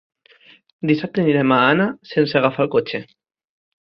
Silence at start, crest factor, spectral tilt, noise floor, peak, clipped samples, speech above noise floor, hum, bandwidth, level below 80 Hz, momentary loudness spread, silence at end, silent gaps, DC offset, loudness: 0.85 s; 18 dB; -8.5 dB/octave; -51 dBFS; -2 dBFS; under 0.1%; 33 dB; none; 6 kHz; -62 dBFS; 10 LU; 0.85 s; none; under 0.1%; -18 LUFS